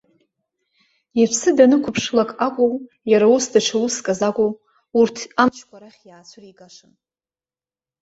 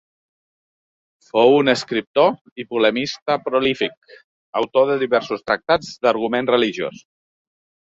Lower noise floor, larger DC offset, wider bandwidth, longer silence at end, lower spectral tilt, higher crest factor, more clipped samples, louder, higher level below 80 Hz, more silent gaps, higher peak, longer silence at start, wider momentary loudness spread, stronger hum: about the same, under -90 dBFS vs under -90 dBFS; neither; about the same, 8 kHz vs 7.8 kHz; first, 1.55 s vs 1 s; about the same, -4 dB/octave vs -5 dB/octave; about the same, 18 dB vs 18 dB; neither; about the same, -18 LUFS vs -19 LUFS; about the same, -62 dBFS vs -60 dBFS; second, none vs 2.07-2.14 s, 2.41-2.45 s, 2.52-2.56 s, 3.22-3.26 s, 3.97-4.02 s, 4.24-4.53 s; about the same, -2 dBFS vs -2 dBFS; second, 1.15 s vs 1.35 s; about the same, 8 LU vs 9 LU; neither